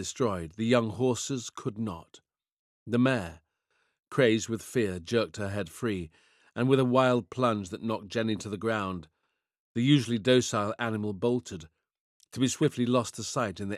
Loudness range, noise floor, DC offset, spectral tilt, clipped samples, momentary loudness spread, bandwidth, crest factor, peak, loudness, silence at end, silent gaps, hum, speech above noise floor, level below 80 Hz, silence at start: 2 LU; -80 dBFS; under 0.1%; -5.5 dB/octave; under 0.1%; 12 LU; 13.5 kHz; 20 dB; -10 dBFS; -29 LUFS; 0 s; 2.52-2.86 s, 9.59-9.75 s, 12.00-12.20 s; none; 52 dB; -66 dBFS; 0 s